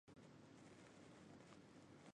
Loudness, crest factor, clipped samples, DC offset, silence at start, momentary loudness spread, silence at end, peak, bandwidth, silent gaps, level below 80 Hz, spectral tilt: -64 LUFS; 18 dB; under 0.1%; under 0.1%; 0.05 s; 1 LU; 0.05 s; -46 dBFS; 10.5 kHz; none; -86 dBFS; -5 dB/octave